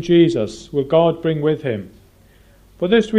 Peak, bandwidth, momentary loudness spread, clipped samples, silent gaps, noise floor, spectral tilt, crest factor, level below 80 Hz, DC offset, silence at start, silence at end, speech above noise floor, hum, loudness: -2 dBFS; 9.4 kHz; 11 LU; under 0.1%; none; -50 dBFS; -7 dB/octave; 16 dB; -50 dBFS; under 0.1%; 0 s; 0 s; 33 dB; none; -18 LUFS